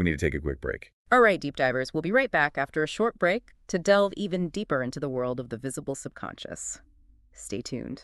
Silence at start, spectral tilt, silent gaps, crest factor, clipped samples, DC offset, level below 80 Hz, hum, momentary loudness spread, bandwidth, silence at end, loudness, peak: 0 s; -5 dB/octave; 0.93-1.05 s; 20 dB; under 0.1%; under 0.1%; -48 dBFS; none; 14 LU; 12 kHz; 0 s; -27 LUFS; -8 dBFS